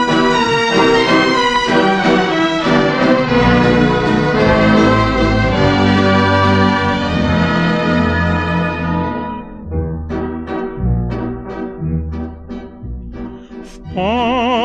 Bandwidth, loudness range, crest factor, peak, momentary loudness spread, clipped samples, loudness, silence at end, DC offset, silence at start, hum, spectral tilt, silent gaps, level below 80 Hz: 9.8 kHz; 10 LU; 14 dB; 0 dBFS; 16 LU; under 0.1%; -14 LUFS; 0 s; 0.4%; 0 s; none; -6 dB/octave; none; -30 dBFS